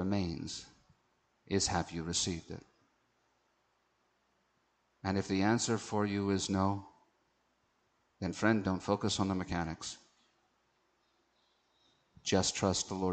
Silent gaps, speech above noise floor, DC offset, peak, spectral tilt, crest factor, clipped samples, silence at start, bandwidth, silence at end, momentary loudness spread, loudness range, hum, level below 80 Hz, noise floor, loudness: none; 43 dB; under 0.1%; -16 dBFS; -4.5 dB/octave; 22 dB; under 0.1%; 0 s; 9.2 kHz; 0 s; 12 LU; 6 LU; none; -60 dBFS; -76 dBFS; -34 LUFS